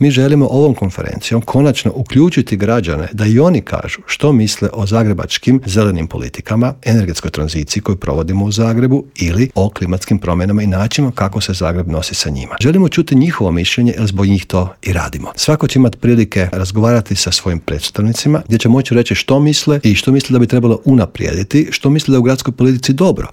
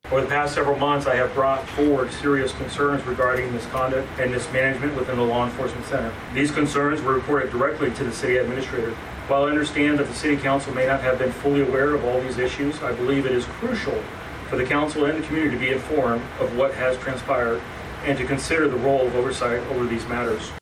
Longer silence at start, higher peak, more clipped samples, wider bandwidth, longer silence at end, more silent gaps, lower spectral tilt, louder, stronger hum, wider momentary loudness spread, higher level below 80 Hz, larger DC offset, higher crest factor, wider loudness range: about the same, 0 s vs 0.05 s; first, 0 dBFS vs -10 dBFS; neither; about the same, 16.5 kHz vs 15 kHz; about the same, 0 s vs 0 s; neither; about the same, -6 dB/octave vs -5.5 dB/octave; first, -13 LUFS vs -23 LUFS; neither; about the same, 7 LU vs 6 LU; first, -34 dBFS vs -44 dBFS; neither; about the same, 12 dB vs 12 dB; about the same, 3 LU vs 2 LU